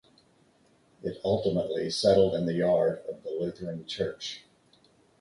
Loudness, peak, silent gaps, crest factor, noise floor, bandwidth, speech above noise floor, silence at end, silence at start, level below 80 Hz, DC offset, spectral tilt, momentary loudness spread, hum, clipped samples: -28 LUFS; -10 dBFS; none; 20 dB; -64 dBFS; 11.5 kHz; 36 dB; 0.8 s; 1.05 s; -58 dBFS; under 0.1%; -5.5 dB/octave; 15 LU; none; under 0.1%